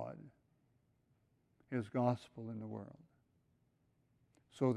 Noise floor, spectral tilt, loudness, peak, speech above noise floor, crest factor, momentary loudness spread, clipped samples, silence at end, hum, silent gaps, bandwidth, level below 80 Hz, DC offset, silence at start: -77 dBFS; -8.5 dB/octave; -41 LUFS; -20 dBFS; 37 dB; 24 dB; 16 LU; under 0.1%; 0 s; none; none; 11 kHz; -78 dBFS; under 0.1%; 0 s